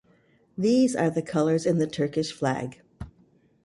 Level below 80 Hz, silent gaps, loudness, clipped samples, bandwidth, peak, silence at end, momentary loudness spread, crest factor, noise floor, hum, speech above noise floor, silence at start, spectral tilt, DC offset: -56 dBFS; none; -25 LUFS; under 0.1%; 11.5 kHz; -12 dBFS; 0.55 s; 22 LU; 16 dB; -62 dBFS; none; 38 dB; 0.55 s; -6 dB/octave; under 0.1%